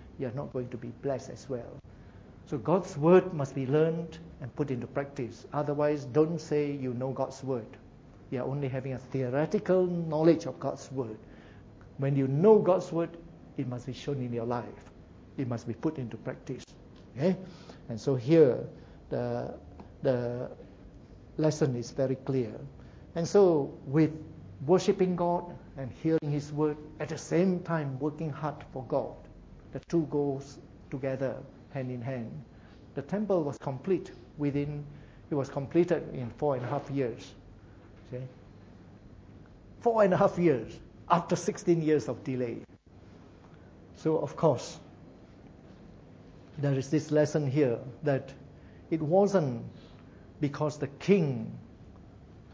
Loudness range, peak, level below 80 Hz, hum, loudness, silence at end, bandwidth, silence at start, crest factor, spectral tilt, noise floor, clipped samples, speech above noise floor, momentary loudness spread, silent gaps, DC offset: 7 LU; -8 dBFS; -58 dBFS; none; -30 LUFS; 0 s; 8 kHz; 0 s; 22 dB; -7.5 dB/octave; -53 dBFS; under 0.1%; 24 dB; 19 LU; none; under 0.1%